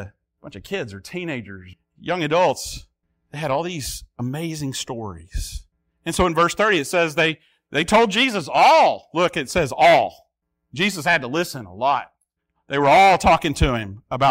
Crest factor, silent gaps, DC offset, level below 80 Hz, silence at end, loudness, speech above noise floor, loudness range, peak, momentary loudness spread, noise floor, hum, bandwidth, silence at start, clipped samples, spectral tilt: 16 dB; none; under 0.1%; -40 dBFS; 0 s; -19 LUFS; 53 dB; 8 LU; -4 dBFS; 18 LU; -73 dBFS; none; 16 kHz; 0 s; under 0.1%; -4 dB/octave